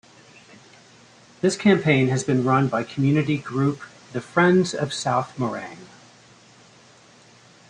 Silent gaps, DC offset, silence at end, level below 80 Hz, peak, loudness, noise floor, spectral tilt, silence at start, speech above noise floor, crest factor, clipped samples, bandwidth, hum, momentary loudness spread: none; under 0.1%; 1.85 s; -62 dBFS; -4 dBFS; -22 LUFS; -51 dBFS; -6 dB/octave; 1.45 s; 30 dB; 20 dB; under 0.1%; 10.5 kHz; none; 16 LU